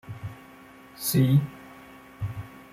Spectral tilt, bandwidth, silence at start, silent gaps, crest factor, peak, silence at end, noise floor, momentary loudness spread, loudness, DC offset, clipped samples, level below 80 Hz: -6 dB/octave; 16 kHz; 0.05 s; none; 18 dB; -10 dBFS; 0.15 s; -49 dBFS; 26 LU; -26 LUFS; under 0.1%; under 0.1%; -56 dBFS